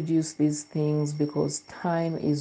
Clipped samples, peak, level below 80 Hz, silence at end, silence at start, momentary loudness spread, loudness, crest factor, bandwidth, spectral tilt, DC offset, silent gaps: under 0.1%; -12 dBFS; -66 dBFS; 0 s; 0 s; 3 LU; -28 LUFS; 14 dB; 9.8 kHz; -6.5 dB/octave; under 0.1%; none